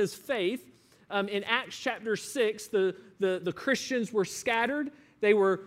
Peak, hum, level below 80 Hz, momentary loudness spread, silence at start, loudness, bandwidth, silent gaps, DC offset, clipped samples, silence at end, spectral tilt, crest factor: -10 dBFS; none; -74 dBFS; 6 LU; 0 s; -30 LUFS; 16 kHz; none; under 0.1%; under 0.1%; 0 s; -4 dB/octave; 20 dB